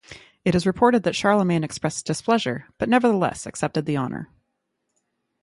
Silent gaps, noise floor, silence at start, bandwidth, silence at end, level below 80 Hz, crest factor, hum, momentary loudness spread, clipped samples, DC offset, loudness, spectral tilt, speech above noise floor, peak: none; -76 dBFS; 0.1 s; 11.5 kHz; 1.2 s; -54 dBFS; 20 dB; none; 10 LU; under 0.1%; under 0.1%; -22 LUFS; -5.5 dB/octave; 55 dB; -4 dBFS